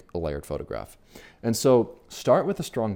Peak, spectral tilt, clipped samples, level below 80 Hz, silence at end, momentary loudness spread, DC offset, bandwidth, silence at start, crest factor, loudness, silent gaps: -8 dBFS; -5.5 dB/octave; under 0.1%; -48 dBFS; 0 s; 14 LU; under 0.1%; 17 kHz; 0.15 s; 18 dB; -25 LUFS; none